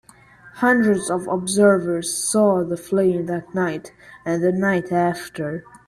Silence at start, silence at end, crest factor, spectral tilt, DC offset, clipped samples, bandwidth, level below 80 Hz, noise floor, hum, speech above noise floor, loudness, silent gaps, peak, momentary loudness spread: 0.45 s; 0.25 s; 16 dB; -5 dB/octave; under 0.1%; under 0.1%; 14 kHz; -58 dBFS; -48 dBFS; none; 28 dB; -20 LUFS; none; -4 dBFS; 12 LU